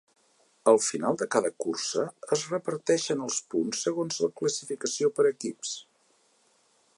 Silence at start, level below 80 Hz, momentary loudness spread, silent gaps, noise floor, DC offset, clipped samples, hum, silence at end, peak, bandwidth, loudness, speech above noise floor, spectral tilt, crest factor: 0.65 s; -82 dBFS; 8 LU; none; -67 dBFS; under 0.1%; under 0.1%; none; 1.15 s; -8 dBFS; 11.5 kHz; -28 LUFS; 39 dB; -3.5 dB/octave; 22 dB